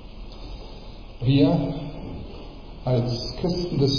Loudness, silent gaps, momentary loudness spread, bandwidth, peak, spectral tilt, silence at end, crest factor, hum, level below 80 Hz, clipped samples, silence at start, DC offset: -24 LUFS; none; 22 LU; 5.4 kHz; -6 dBFS; -7.5 dB/octave; 0 s; 18 dB; none; -38 dBFS; under 0.1%; 0 s; under 0.1%